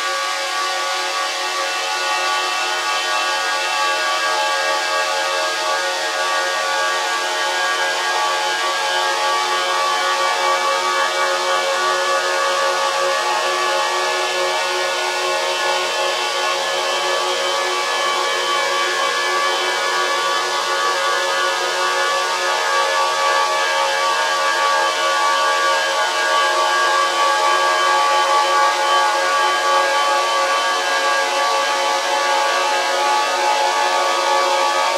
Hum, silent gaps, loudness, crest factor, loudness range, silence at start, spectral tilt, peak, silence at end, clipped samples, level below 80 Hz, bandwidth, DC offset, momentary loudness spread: none; none; -17 LUFS; 14 dB; 3 LU; 0 s; 1 dB/octave; -4 dBFS; 0 s; under 0.1%; -80 dBFS; 16 kHz; under 0.1%; 3 LU